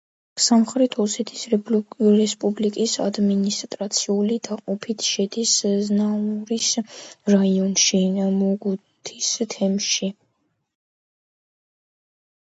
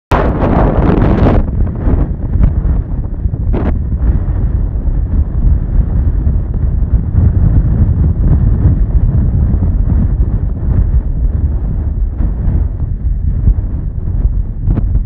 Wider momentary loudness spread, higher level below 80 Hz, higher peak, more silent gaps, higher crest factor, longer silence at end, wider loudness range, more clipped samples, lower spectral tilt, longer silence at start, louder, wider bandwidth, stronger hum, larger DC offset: first, 9 LU vs 6 LU; second, -70 dBFS vs -12 dBFS; second, -4 dBFS vs 0 dBFS; neither; first, 18 dB vs 10 dB; first, 2.45 s vs 0 s; about the same, 6 LU vs 4 LU; neither; second, -4 dB/octave vs -11 dB/octave; first, 0.35 s vs 0.1 s; second, -21 LUFS vs -14 LUFS; first, 8 kHz vs 3.9 kHz; neither; neither